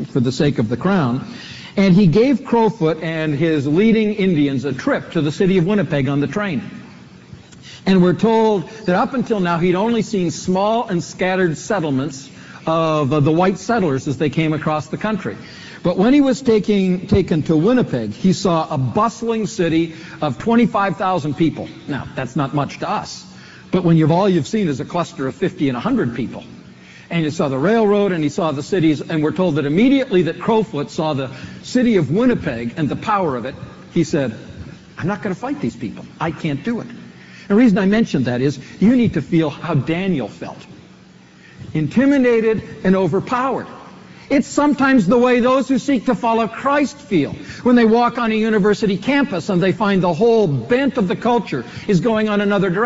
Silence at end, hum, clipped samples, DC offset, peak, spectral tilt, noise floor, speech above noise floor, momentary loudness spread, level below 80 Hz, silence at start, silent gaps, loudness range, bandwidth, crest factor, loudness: 0 s; none; under 0.1%; under 0.1%; -4 dBFS; -6 dB/octave; -45 dBFS; 28 dB; 11 LU; -48 dBFS; 0 s; none; 4 LU; 8 kHz; 14 dB; -17 LUFS